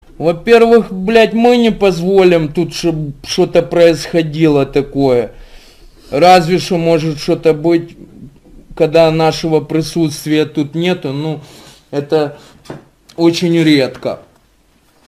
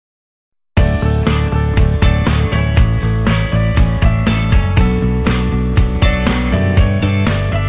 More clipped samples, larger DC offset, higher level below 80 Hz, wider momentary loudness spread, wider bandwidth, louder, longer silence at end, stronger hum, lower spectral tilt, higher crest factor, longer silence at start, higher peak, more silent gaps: neither; neither; second, -40 dBFS vs -16 dBFS; first, 13 LU vs 2 LU; first, 15 kHz vs 4 kHz; about the same, -12 LUFS vs -14 LUFS; first, 0.9 s vs 0 s; neither; second, -6 dB/octave vs -11 dB/octave; about the same, 12 dB vs 12 dB; second, 0.2 s vs 0.75 s; about the same, 0 dBFS vs 0 dBFS; neither